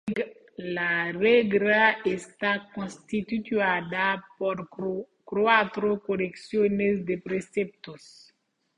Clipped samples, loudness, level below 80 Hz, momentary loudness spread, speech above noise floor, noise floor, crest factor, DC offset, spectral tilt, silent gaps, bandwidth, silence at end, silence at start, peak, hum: under 0.1%; -26 LUFS; -64 dBFS; 13 LU; 42 dB; -68 dBFS; 22 dB; under 0.1%; -6 dB/octave; none; 10.5 kHz; 0.8 s; 0.05 s; -6 dBFS; none